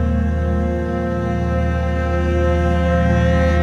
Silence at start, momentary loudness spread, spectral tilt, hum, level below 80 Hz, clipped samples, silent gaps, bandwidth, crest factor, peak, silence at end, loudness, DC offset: 0 s; 5 LU; -8 dB/octave; none; -22 dBFS; under 0.1%; none; 7 kHz; 12 dB; -4 dBFS; 0 s; -18 LUFS; under 0.1%